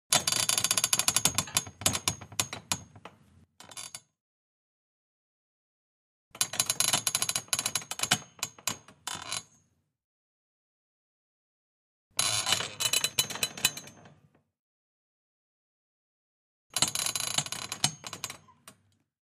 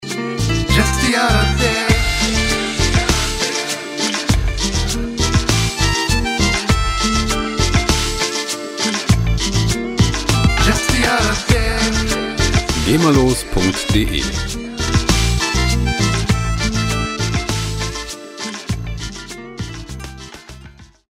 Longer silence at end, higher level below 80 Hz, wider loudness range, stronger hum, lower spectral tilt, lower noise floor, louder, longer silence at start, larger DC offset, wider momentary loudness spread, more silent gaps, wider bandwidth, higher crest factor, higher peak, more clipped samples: first, 0.5 s vs 0.25 s; second, -66 dBFS vs -24 dBFS; first, 12 LU vs 6 LU; neither; second, -0.5 dB/octave vs -4 dB/octave; first, -70 dBFS vs -41 dBFS; second, -28 LUFS vs -17 LUFS; about the same, 0.1 s vs 0 s; neither; first, 14 LU vs 11 LU; first, 4.20-6.31 s, 10.04-12.11 s, 14.59-16.70 s vs none; about the same, 15.5 kHz vs 16 kHz; first, 28 dB vs 16 dB; second, -6 dBFS vs 0 dBFS; neither